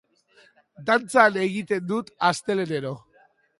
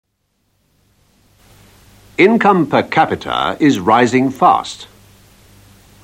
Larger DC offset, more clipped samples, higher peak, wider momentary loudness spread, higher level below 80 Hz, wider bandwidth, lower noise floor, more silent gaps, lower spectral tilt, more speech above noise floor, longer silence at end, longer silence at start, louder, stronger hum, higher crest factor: neither; neither; about the same, -2 dBFS vs 0 dBFS; first, 14 LU vs 8 LU; second, -70 dBFS vs -52 dBFS; second, 11.5 kHz vs 16 kHz; second, -60 dBFS vs -65 dBFS; neither; about the same, -4.5 dB/octave vs -5.5 dB/octave; second, 37 dB vs 52 dB; second, 0.6 s vs 1.2 s; second, 0.8 s vs 2.2 s; second, -23 LUFS vs -13 LUFS; neither; first, 24 dB vs 16 dB